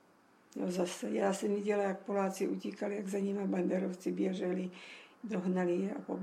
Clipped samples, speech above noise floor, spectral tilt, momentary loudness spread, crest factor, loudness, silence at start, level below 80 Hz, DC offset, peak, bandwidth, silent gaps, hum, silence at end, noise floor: under 0.1%; 31 dB; -6.5 dB/octave; 8 LU; 16 dB; -35 LUFS; 0.55 s; -82 dBFS; under 0.1%; -20 dBFS; 14.5 kHz; none; none; 0 s; -65 dBFS